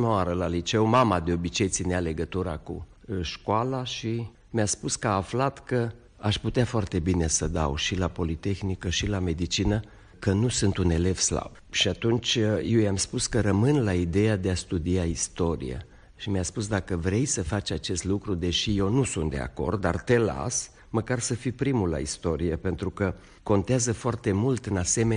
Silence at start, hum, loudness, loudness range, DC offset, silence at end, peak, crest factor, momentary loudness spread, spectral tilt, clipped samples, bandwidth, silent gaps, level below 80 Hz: 0 s; none; -27 LUFS; 4 LU; under 0.1%; 0 s; -10 dBFS; 16 dB; 7 LU; -4.5 dB/octave; under 0.1%; 10 kHz; none; -44 dBFS